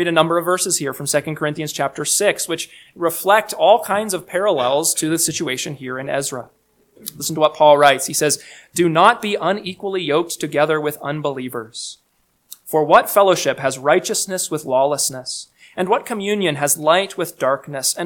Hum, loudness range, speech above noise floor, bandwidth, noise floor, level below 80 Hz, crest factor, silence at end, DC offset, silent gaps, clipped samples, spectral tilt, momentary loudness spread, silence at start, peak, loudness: none; 4 LU; 45 dB; 19 kHz; -63 dBFS; -64 dBFS; 18 dB; 0 s; under 0.1%; none; under 0.1%; -3 dB/octave; 13 LU; 0 s; 0 dBFS; -18 LUFS